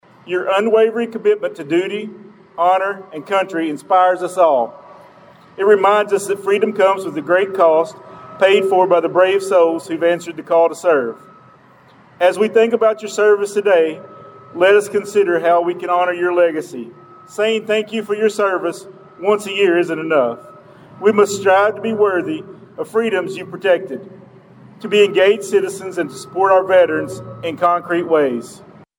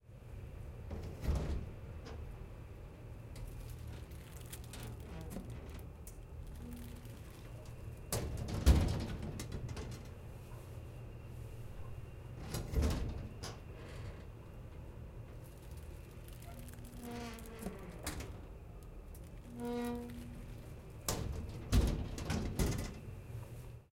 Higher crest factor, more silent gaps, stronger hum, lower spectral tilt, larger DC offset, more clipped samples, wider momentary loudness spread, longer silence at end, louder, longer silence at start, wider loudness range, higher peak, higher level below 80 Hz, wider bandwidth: second, 14 dB vs 26 dB; neither; neither; about the same, -4.5 dB/octave vs -5.5 dB/octave; neither; neither; about the same, 13 LU vs 15 LU; first, 0.4 s vs 0.05 s; first, -16 LUFS vs -43 LUFS; first, 0.25 s vs 0.05 s; second, 3 LU vs 11 LU; first, -2 dBFS vs -14 dBFS; second, -70 dBFS vs -44 dBFS; about the same, 16.5 kHz vs 16.5 kHz